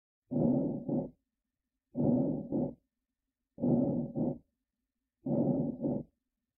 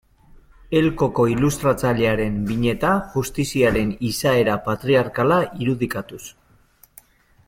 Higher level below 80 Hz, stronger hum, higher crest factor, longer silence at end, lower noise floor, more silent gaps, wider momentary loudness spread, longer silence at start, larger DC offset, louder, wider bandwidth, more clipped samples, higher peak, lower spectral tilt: second, -62 dBFS vs -42 dBFS; neither; about the same, 16 dB vs 16 dB; second, 0.55 s vs 1.15 s; first, -89 dBFS vs -55 dBFS; neither; first, 13 LU vs 6 LU; second, 0.3 s vs 0.7 s; neither; second, -33 LUFS vs -20 LUFS; second, 1.4 kHz vs 16.5 kHz; neither; second, -18 dBFS vs -6 dBFS; first, -16 dB/octave vs -6 dB/octave